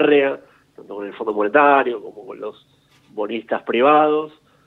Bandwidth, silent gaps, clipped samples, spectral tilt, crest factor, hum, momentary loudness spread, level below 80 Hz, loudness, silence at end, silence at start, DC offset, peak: 4.2 kHz; none; under 0.1%; -7 dB/octave; 18 dB; none; 20 LU; -72 dBFS; -18 LUFS; 0.4 s; 0 s; under 0.1%; 0 dBFS